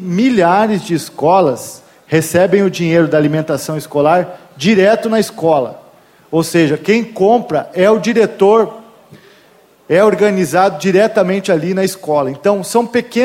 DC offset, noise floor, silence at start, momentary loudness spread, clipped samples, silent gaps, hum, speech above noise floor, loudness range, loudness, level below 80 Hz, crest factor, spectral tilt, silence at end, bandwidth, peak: under 0.1%; -47 dBFS; 0 s; 7 LU; under 0.1%; none; none; 35 dB; 1 LU; -13 LUFS; -56 dBFS; 14 dB; -5.5 dB/octave; 0 s; 16.5 kHz; 0 dBFS